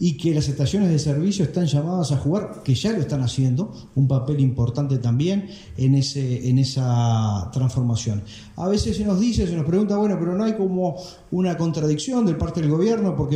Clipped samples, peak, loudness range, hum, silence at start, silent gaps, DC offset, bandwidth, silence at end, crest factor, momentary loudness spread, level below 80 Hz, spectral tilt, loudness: under 0.1%; -8 dBFS; 1 LU; none; 0 s; none; under 0.1%; 11 kHz; 0 s; 12 dB; 5 LU; -42 dBFS; -7 dB/octave; -22 LUFS